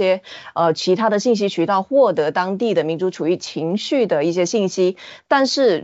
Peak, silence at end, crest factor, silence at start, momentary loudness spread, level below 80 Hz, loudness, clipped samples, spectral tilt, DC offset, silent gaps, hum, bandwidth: -4 dBFS; 0 s; 14 dB; 0 s; 6 LU; -70 dBFS; -19 LUFS; under 0.1%; -4 dB/octave; under 0.1%; none; none; 8 kHz